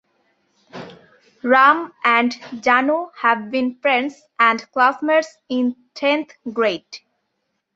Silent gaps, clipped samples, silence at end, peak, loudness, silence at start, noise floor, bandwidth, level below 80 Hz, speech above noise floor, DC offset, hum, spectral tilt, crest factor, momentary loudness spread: none; under 0.1%; 0.75 s; -2 dBFS; -18 LUFS; 0.75 s; -74 dBFS; 7.8 kHz; -70 dBFS; 55 dB; under 0.1%; none; -4 dB/octave; 18 dB; 14 LU